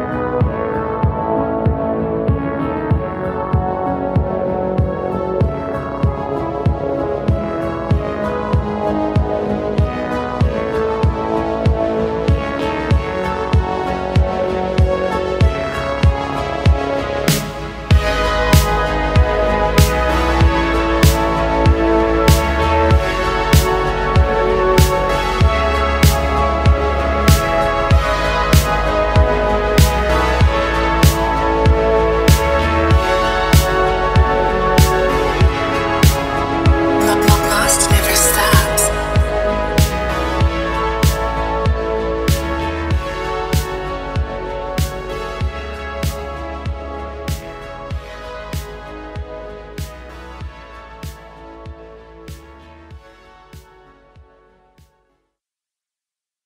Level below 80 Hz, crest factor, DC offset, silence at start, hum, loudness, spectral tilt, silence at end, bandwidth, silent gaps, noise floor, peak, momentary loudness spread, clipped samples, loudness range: -22 dBFS; 16 dB; under 0.1%; 0 s; none; -16 LUFS; -5 dB/octave; 2.85 s; 16.5 kHz; none; -89 dBFS; 0 dBFS; 13 LU; under 0.1%; 12 LU